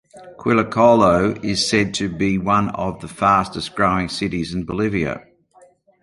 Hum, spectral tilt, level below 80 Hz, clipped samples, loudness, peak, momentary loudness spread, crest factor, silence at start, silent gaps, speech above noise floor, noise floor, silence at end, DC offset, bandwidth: none; -5 dB/octave; -44 dBFS; under 0.1%; -19 LUFS; -2 dBFS; 12 LU; 18 dB; 0.15 s; none; 34 dB; -52 dBFS; 0.85 s; under 0.1%; 11.5 kHz